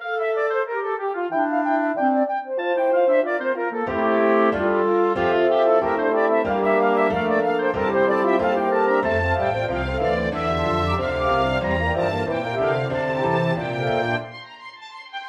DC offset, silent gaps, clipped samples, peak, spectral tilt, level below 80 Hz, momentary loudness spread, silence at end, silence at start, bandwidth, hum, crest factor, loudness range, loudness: under 0.1%; none; under 0.1%; -6 dBFS; -7.5 dB/octave; -42 dBFS; 6 LU; 0 s; 0 s; 9.2 kHz; none; 14 dB; 3 LU; -21 LUFS